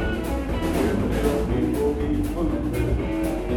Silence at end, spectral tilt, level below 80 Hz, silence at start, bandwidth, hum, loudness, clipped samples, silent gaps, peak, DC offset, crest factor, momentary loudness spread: 0 s; -7 dB/octave; -30 dBFS; 0 s; 17.5 kHz; none; -24 LUFS; under 0.1%; none; -8 dBFS; under 0.1%; 14 dB; 3 LU